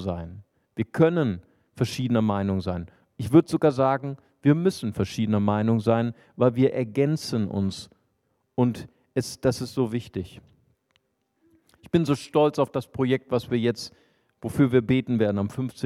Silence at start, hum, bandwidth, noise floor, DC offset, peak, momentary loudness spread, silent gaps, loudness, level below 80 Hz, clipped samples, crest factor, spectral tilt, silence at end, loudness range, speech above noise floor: 0 s; none; 14.5 kHz; -72 dBFS; under 0.1%; -6 dBFS; 14 LU; none; -25 LUFS; -56 dBFS; under 0.1%; 20 dB; -7 dB/octave; 0 s; 6 LU; 49 dB